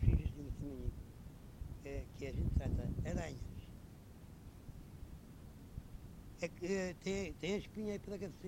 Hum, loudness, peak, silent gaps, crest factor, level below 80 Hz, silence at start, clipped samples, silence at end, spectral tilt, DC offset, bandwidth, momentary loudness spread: none; -43 LUFS; -18 dBFS; none; 24 dB; -46 dBFS; 0 s; under 0.1%; 0 s; -6.5 dB/octave; under 0.1%; 16 kHz; 17 LU